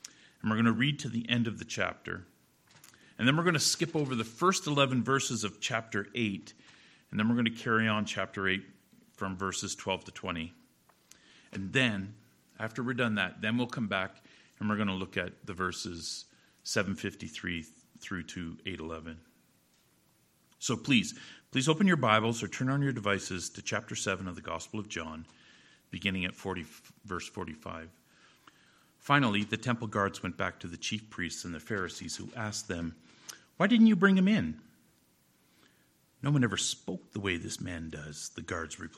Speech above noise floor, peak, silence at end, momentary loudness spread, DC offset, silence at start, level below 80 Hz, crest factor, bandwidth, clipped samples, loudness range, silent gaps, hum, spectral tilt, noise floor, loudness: 37 dB; -8 dBFS; 0 s; 15 LU; under 0.1%; 0.05 s; -64 dBFS; 26 dB; 14 kHz; under 0.1%; 9 LU; none; none; -4.5 dB/octave; -68 dBFS; -32 LUFS